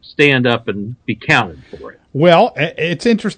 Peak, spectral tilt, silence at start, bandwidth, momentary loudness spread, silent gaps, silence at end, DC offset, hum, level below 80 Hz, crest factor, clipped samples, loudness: 0 dBFS; -6 dB/octave; 0.2 s; 9.4 kHz; 17 LU; none; 0.05 s; under 0.1%; none; -50 dBFS; 16 dB; 0.1%; -14 LUFS